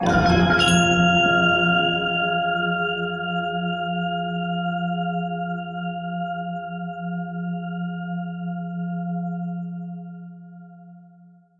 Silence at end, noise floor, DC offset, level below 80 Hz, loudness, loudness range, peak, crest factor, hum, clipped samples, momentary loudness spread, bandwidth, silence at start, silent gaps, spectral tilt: 0.5 s; -51 dBFS; under 0.1%; -46 dBFS; -22 LUFS; 11 LU; -6 dBFS; 18 dB; none; under 0.1%; 14 LU; 11 kHz; 0 s; none; -5 dB/octave